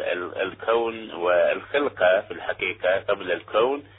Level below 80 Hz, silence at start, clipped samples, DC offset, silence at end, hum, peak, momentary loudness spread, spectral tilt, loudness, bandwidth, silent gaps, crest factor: -60 dBFS; 0 s; under 0.1%; under 0.1%; 0.15 s; none; -8 dBFS; 7 LU; -8 dB/octave; -24 LUFS; 4 kHz; none; 16 dB